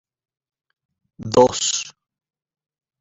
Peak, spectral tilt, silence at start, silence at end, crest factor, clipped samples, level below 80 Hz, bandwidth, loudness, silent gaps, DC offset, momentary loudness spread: -2 dBFS; -3 dB/octave; 1.2 s; 1.1 s; 22 dB; under 0.1%; -56 dBFS; 8.4 kHz; -18 LUFS; none; under 0.1%; 20 LU